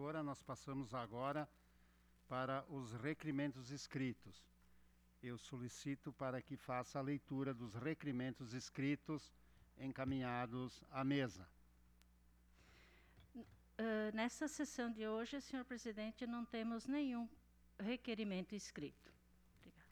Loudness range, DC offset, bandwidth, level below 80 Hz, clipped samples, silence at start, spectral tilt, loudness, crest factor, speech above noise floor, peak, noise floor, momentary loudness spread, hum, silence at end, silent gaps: 4 LU; under 0.1%; 19 kHz; -72 dBFS; under 0.1%; 0 s; -5.5 dB/octave; -46 LUFS; 18 dB; 26 dB; -30 dBFS; -72 dBFS; 10 LU; 60 Hz at -70 dBFS; 0.05 s; none